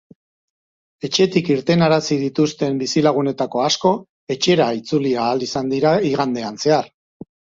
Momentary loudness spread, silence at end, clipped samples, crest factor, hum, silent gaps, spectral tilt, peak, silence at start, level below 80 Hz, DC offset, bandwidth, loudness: 6 LU; 0.7 s; under 0.1%; 16 dB; none; 4.09-4.27 s; -5 dB/octave; -2 dBFS; 1.05 s; -58 dBFS; under 0.1%; 7.8 kHz; -18 LUFS